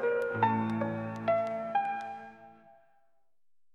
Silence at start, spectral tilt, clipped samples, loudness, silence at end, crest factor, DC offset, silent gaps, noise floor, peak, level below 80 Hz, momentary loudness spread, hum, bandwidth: 0 s; -8 dB/octave; under 0.1%; -32 LUFS; 1.2 s; 18 dB; under 0.1%; none; -76 dBFS; -14 dBFS; -72 dBFS; 13 LU; none; 12 kHz